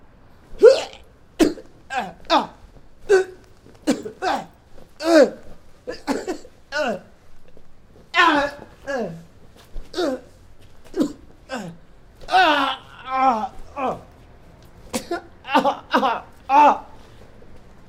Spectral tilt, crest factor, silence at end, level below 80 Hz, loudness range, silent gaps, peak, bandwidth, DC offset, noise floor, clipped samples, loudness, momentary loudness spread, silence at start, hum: -4 dB/octave; 22 dB; 0.3 s; -46 dBFS; 4 LU; none; 0 dBFS; 16 kHz; under 0.1%; -47 dBFS; under 0.1%; -21 LUFS; 18 LU; 0.5 s; none